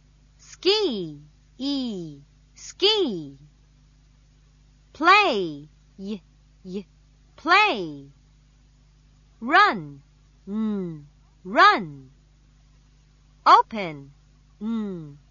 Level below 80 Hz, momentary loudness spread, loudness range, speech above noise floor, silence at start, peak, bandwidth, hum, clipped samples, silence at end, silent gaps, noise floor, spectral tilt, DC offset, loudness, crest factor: -58 dBFS; 24 LU; 5 LU; 33 dB; 0.5 s; -4 dBFS; 7.4 kHz; 50 Hz at -55 dBFS; under 0.1%; 0.15 s; none; -56 dBFS; -4 dB/octave; under 0.1%; -21 LUFS; 22 dB